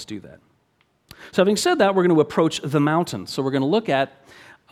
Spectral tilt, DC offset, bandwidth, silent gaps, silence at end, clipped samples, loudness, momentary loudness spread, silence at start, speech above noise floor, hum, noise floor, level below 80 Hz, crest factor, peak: -5.5 dB/octave; under 0.1%; 15 kHz; none; 0.65 s; under 0.1%; -20 LUFS; 9 LU; 0 s; 45 dB; none; -65 dBFS; -62 dBFS; 18 dB; -2 dBFS